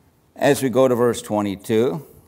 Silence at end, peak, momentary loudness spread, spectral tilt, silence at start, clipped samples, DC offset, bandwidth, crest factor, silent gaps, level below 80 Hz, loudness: 0.25 s; -4 dBFS; 6 LU; -5.5 dB/octave; 0.4 s; under 0.1%; under 0.1%; 16 kHz; 16 dB; none; -60 dBFS; -20 LUFS